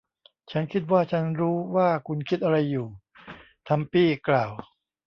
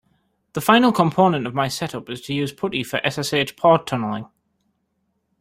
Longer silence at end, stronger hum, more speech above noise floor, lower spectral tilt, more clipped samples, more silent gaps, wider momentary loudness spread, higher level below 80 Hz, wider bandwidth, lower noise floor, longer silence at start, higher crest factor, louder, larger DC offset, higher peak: second, 0.45 s vs 1.15 s; neither; second, 26 dB vs 51 dB; first, -9 dB/octave vs -5 dB/octave; neither; neither; first, 19 LU vs 13 LU; about the same, -62 dBFS vs -58 dBFS; second, 6.4 kHz vs 16 kHz; second, -50 dBFS vs -71 dBFS; about the same, 0.5 s vs 0.55 s; about the same, 18 dB vs 20 dB; second, -25 LUFS vs -20 LUFS; neither; second, -8 dBFS vs 0 dBFS